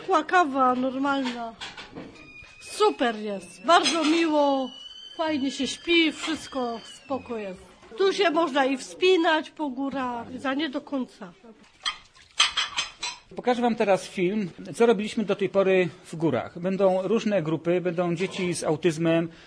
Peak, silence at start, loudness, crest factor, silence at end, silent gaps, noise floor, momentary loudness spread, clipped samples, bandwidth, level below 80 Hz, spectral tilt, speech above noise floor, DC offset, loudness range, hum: -6 dBFS; 0 s; -25 LUFS; 20 dB; 0.1 s; none; -45 dBFS; 16 LU; under 0.1%; 11 kHz; -64 dBFS; -4.5 dB/octave; 20 dB; under 0.1%; 4 LU; none